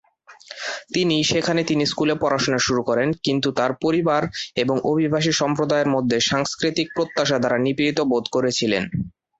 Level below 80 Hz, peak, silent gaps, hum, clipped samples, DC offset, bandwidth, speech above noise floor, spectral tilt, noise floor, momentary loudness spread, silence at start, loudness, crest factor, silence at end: -54 dBFS; -6 dBFS; none; none; under 0.1%; under 0.1%; 8.2 kHz; 23 dB; -4.5 dB/octave; -44 dBFS; 4 LU; 0.3 s; -21 LUFS; 16 dB; 0.3 s